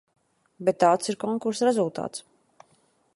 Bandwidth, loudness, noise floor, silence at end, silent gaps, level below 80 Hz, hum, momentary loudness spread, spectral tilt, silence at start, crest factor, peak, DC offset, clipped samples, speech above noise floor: 11.5 kHz; -25 LUFS; -65 dBFS; 0.95 s; none; -74 dBFS; none; 13 LU; -5 dB/octave; 0.6 s; 20 dB; -6 dBFS; under 0.1%; under 0.1%; 41 dB